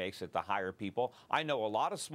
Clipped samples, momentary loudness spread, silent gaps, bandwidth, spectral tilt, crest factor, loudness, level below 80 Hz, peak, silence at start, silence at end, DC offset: under 0.1%; 5 LU; none; 16 kHz; -4 dB/octave; 20 dB; -36 LUFS; -76 dBFS; -16 dBFS; 0 s; 0 s; under 0.1%